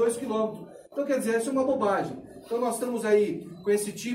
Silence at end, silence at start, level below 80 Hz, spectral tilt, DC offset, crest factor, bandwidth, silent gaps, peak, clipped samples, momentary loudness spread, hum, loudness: 0 s; 0 s; -68 dBFS; -4.5 dB/octave; under 0.1%; 16 dB; 16 kHz; none; -12 dBFS; under 0.1%; 10 LU; none; -28 LUFS